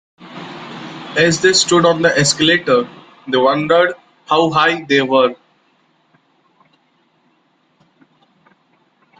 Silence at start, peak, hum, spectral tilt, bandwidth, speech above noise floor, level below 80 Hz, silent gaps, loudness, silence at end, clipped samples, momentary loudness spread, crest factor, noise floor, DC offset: 0.2 s; 0 dBFS; none; -3.5 dB/octave; 9.6 kHz; 46 dB; -56 dBFS; none; -14 LUFS; 3.85 s; under 0.1%; 19 LU; 16 dB; -59 dBFS; under 0.1%